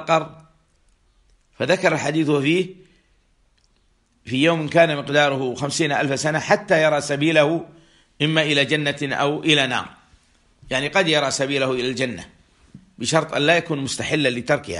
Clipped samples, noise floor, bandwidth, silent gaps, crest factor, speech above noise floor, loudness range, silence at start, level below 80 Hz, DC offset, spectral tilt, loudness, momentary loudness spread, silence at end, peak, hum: under 0.1%; -62 dBFS; 11.5 kHz; none; 20 dB; 42 dB; 4 LU; 0 s; -58 dBFS; under 0.1%; -4 dB/octave; -20 LUFS; 8 LU; 0 s; -2 dBFS; none